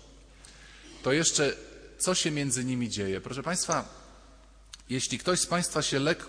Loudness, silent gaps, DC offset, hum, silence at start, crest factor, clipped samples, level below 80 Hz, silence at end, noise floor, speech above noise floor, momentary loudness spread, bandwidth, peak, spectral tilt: -28 LUFS; none; under 0.1%; none; 0 s; 18 dB; under 0.1%; -56 dBFS; 0 s; -54 dBFS; 25 dB; 24 LU; 11 kHz; -12 dBFS; -3 dB/octave